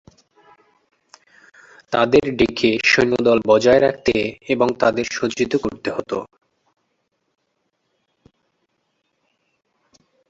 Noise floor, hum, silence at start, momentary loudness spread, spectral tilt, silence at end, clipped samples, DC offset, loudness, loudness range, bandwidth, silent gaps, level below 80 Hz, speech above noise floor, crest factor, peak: -71 dBFS; none; 1.9 s; 10 LU; -4.5 dB/octave; 4.05 s; under 0.1%; under 0.1%; -18 LUFS; 13 LU; 8 kHz; none; -52 dBFS; 54 dB; 20 dB; -2 dBFS